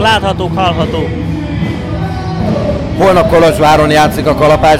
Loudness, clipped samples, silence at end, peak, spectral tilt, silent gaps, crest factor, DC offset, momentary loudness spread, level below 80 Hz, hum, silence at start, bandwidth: -11 LUFS; under 0.1%; 0 s; -2 dBFS; -6 dB/octave; none; 8 dB; under 0.1%; 10 LU; -26 dBFS; none; 0 s; 16.5 kHz